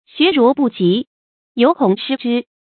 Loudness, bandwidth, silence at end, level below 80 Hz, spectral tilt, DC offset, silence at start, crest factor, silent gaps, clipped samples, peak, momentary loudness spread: -16 LUFS; 4.6 kHz; 0.3 s; -64 dBFS; -11 dB/octave; under 0.1%; 0.15 s; 16 dB; 1.07-1.55 s; under 0.1%; 0 dBFS; 9 LU